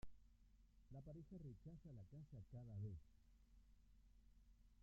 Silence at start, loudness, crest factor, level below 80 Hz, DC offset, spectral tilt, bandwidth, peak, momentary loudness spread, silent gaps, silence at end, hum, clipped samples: 0 s; -59 LUFS; 16 dB; -70 dBFS; under 0.1%; -10.5 dB/octave; 7.2 kHz; -44 dBFS; 8 LU; none; 0 s; none; under 0.1%